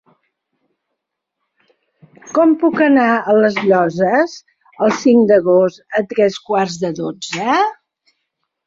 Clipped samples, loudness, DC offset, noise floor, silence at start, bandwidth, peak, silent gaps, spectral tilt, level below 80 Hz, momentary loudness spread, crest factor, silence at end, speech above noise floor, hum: under 0.1%; -15 LUFS; under 0.1%; -77 dBFS; 2.25 s; 7.8 kHz; -2 dBFS; none; -5.5 dB/octave; -62 dBFS; 10 LU; 14 dB; 0.95 s; 63 dB; none